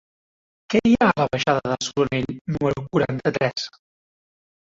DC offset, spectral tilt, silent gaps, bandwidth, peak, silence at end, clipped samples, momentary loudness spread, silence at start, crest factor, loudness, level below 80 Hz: under 0.1%; -5.5 dB/octave; 2.41-2.45 s; 7.8 kHz; -4 dBFS; 1 s; under 0.1%; 8 LU; 0.7 s; 18 dB; -22 LUFS; -52 dBFS